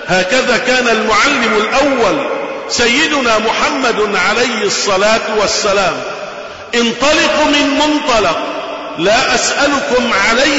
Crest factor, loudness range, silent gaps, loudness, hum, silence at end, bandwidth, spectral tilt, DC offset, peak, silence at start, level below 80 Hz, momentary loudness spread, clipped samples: 10 dB; 2 LU; none; -12 LUFS; none; 0 s; 8 kHz; -2 dB/octave; 0.7%; -2 dBFS; 0 s; -40 dBFS; 8 LU; under 0.1%